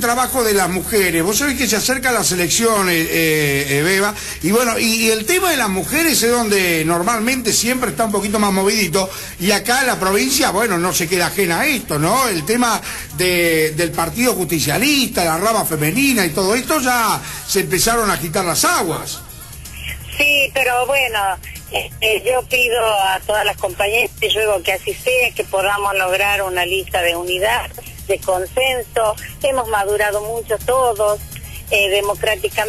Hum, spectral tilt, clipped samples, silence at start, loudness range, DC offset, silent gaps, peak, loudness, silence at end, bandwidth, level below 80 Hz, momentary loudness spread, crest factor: none; -3 dB/octave; under 0.1%; 0 s; 3 LU; 0.2%; none; -4 dBFS; -16 LUFS; 0 s; 13.5 kHz; -38 dBFS; 7 LU; 12 dB